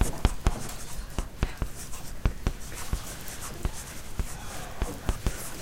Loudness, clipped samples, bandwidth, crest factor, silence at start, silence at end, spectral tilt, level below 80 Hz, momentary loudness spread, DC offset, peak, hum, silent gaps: -35 LUFS; under 0.1%; 17 kHz; 26 dB; 0 s; 0 s; -4.5 dB/octave; -34 dBFS; 8 LU; under 0.1%; -6 dBFS; none; none